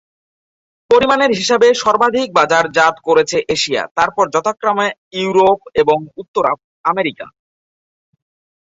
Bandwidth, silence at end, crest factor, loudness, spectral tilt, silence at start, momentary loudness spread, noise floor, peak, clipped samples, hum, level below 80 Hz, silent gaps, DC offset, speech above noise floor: 8 kHz; 1.45 s; 16 dB; -14 LUFS; -3.5 dB/octave; 0.9 s; 8 LU; under -90 dBFS; 0 dBFS; under 0.1%; none; -54 dBFS; 3.91-3.95 s, 4.98-5.11 s, 6.28-6.34 s, 6.64-6.84 s; under 0.1%; over 76 dB